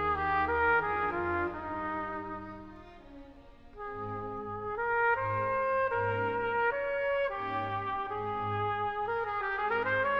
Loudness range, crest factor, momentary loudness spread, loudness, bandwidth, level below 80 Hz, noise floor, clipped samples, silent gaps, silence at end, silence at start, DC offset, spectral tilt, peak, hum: 8 LU; 16 dB; 14 LU; -31 LUFS; 6.6 kHz; -54 dBFS; -52 dBFS; under 0.1%; none; 0 s; 0 s; under 0.1%; -7.5 dB/octave; -16 dBFS; none